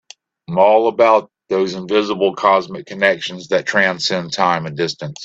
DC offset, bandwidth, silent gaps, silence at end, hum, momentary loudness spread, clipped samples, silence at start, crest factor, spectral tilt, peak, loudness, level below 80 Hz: under 0.1%; 8 kHz; none; 0 s; none; 9 LU; under 0.1%; 0.5 s; 16 dB; -4.5 dB/octave; 0 dBFS; -16 LUFS; -62 dBFS